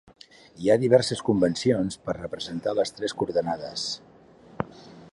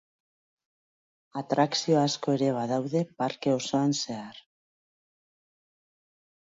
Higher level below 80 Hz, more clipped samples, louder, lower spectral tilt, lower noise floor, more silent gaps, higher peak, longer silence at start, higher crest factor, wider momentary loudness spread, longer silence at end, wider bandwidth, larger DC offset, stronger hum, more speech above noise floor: first, -58 dBFS vs -76 dBFS; neither; about the same, -26 LUFS vs -27 LUFS; about the same, -5.5 dB/octave vs -5 dB/octave; second, -51 dBFS vs under -90 dBFS; neither; first, -6 dBFS vs -10 dBFS; second, 0.55 s vs 1.35 s; about the same, 20 dB vs 20 dB; about the same, 15 LU vs 13 LU; second, 0.05 s vs 2.15 s; first, 11.5 kHz vs 8 kHz; neither; neither; second, 26 dB vs over 63 dB